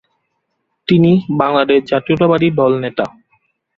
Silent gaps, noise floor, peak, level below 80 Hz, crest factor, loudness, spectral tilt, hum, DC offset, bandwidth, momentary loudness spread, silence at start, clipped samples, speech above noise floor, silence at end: none; -70 dBFS; 0 dBFS; -50 dBFS; 14 dB; -14 LUFS; -9 dB/octave; none; under 0.1%; 6.6 kHz; 10 LU; 0.9 s; under 0.1%; 57 dB; 0.7 s